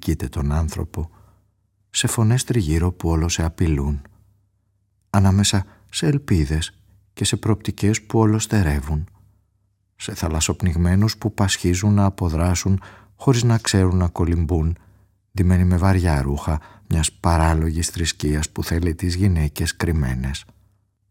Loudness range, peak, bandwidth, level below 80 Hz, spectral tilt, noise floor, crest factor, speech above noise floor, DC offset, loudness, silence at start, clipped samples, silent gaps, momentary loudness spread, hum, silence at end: 3 LU; -2 dBFS; 16.5 kHz; -34 dBFS; -5.5 dB/octave; -66 dBFS; 20 dB; 47 dB; under 0.1%; -21 LUFS; 0 s; under 0.1%; none; 9 LU; none; 0.7 s